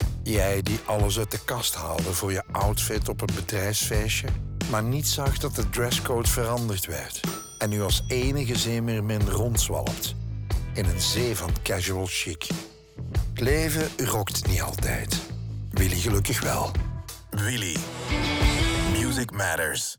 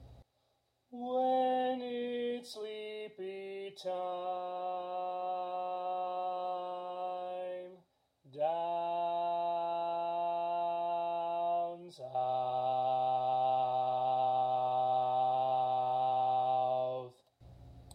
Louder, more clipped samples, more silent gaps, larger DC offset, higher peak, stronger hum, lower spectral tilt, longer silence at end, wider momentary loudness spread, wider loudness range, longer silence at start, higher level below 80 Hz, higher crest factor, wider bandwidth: first, -26 LUFS vs -35 LUFS; neither; neither; neither; first, -8 dBFS vs -22 dBFS; neither; second, -4 dB/octave vs -6 dB/octave; about the same, 0.05 s vs 0 s; second, 7 LU vs 12 LU; second, 1 LU vs 8 LU; about the same, 0 s vs 0 s; first, -34 dBFS vs -72 dBFS; first, 18 dB vs 12 dB; first, over 20 kHz vs 10 kHz